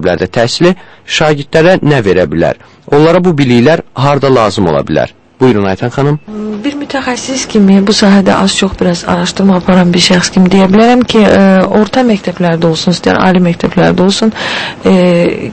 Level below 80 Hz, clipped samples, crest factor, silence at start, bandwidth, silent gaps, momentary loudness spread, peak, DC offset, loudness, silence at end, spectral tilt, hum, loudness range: -36 dBFS; 1%; 8 dB; 0 s; 8.8 kHz; none; 8 LU; 0 dBFS; under 0.1%; -9 LUFS; 0 s; -5.5 dB/octave; none; 4 LU